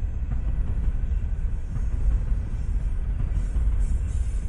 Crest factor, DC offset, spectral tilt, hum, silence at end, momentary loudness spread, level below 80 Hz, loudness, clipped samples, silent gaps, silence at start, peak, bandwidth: 12 dB; under 0.1%; -8 dB/octave; none; 0 s; 4 LU; -24 dBFS; -29 LUFS; under 0.1%; none; 0 s; -12 dBFS; 9.6 kHz